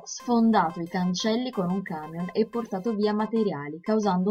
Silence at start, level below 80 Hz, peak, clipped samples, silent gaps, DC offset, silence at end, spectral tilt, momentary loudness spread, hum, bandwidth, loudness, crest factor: 0 s; -64 dBFS; -10 dBFS; under 0.1%; none; under 0.1%; 0 s; -6 dB/octave; 9 LU; none; 7.6 kHz; -26 LUFS; 16 dB